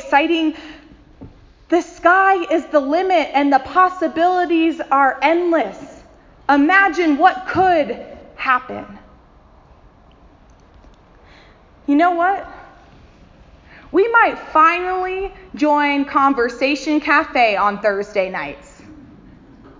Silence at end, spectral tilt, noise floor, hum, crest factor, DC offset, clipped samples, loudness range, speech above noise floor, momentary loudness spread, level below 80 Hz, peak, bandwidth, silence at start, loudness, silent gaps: 0.8 s; -5 dB/octave; -48 dBFS; none; 18 dB; under 0.1%; under 0.1%; 7 LU; 32 dB; 13 LU; -50 dBFS; 0 dBFS; 7.6 kHz; 0 s; -16 LUFS; none